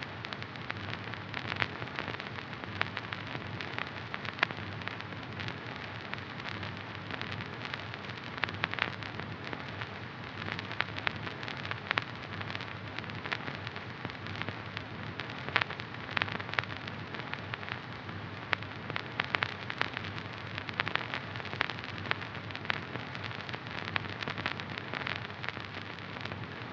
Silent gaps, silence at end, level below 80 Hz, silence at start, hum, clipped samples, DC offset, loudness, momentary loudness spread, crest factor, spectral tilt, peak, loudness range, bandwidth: none; 0 s; -64 dBFS; 0 s; none; under 0.1%; under 0.1%; -37 LUFS; 7 LU; 34 dB; -5.5 dB/octave; -4 dBFS; 2 LU; 8 kHz